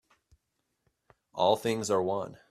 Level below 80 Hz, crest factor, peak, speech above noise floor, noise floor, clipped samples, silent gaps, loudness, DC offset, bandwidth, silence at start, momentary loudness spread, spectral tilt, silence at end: -72 dBFS; 20 dB; -12 dBFS; 52 dB; -81 dBFS; under 0.1%; none; -29 LUFS; under 0.1%; 15 kHz; 1.35 s; 9 LU; -4.5 dB/octave; 0.15 s